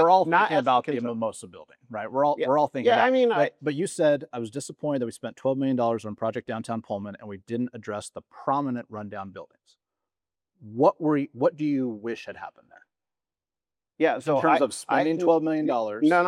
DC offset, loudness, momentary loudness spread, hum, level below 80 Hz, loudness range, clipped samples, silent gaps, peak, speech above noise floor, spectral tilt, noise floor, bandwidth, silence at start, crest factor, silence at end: under 0.1%; -25 LUFS; 16 LU; none; -78 dBFS; 8 LU; under 0.1%; none; -6 dBFS; over 65 dB; -5.5 dB/octave; under -90 dBFS; 12.5 kHz; 0 s; 20 dB; 0 s